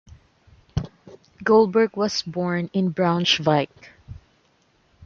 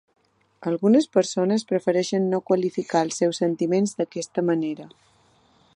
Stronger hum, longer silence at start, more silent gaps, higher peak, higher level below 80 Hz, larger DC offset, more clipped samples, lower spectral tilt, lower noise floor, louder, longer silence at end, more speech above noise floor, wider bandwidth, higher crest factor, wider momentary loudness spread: neither; second, 0.1 s vs 0.6 s; neither; about the same, -4 dBFS vs -6 dBFS; first, -50 dBFS vs -74 dBFS; neither; neither; about the same, -5.5 dB/octave vs -5.5 dB/octave; about the same, -62 dBFS vs -60 dBFS; about the same, -22 LUFS vs -23 LUFS; second, 0 s vs 0.9 s; first, 42 dB vs 38 dB; second, 7.4 kHz vs 11 kHz; about the same, 20 dB vs 18 dB; first, 14 LU vs 9 LU